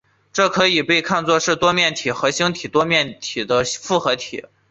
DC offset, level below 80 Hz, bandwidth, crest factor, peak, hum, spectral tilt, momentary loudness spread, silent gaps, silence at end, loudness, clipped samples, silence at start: under 0.1%; -56 dBFS; 8.4 kHz; 16 dB; -2 dBFS; none; -3 dB/octave; 8 LU; none; 0.3 s; -18 LUFS; under 0.1%; 0.35 s